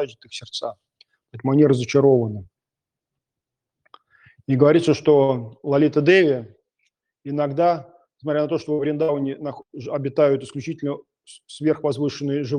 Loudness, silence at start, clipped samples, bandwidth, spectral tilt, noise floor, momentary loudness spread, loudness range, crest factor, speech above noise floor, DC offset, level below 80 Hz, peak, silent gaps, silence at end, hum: -20 LUFS; 0 s; under 0.1%; 10 kHz; -7 dB/octave; -87 dBFS; 16 LU; 5 LU; 20 dB; 67 dB; under 0.1%; -66 dBFS; -2 dBFS; none; 0 s; none